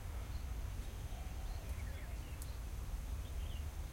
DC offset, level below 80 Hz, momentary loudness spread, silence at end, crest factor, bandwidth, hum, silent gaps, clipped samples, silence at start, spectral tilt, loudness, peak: under 0.1%; -44 dBFS; 2 LU; 0 s; 14 dB; 16.5 kHz; none; none; under 0.1%; 0 s; -5 dB/octave; -47 LUFS; -30 dBFS